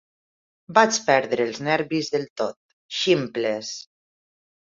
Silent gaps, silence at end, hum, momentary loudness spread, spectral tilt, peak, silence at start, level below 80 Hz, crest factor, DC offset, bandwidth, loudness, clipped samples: 2.30-2.36 s, 2.56-2.89 s; 0.85 s; none; 12 LU; -3.5 dB/octave; -2 dBFS; 0.7 s; -68 dBFS; 22 dB; under 0.1%; 7.8 kHz; -23 LUFS; under 0.1%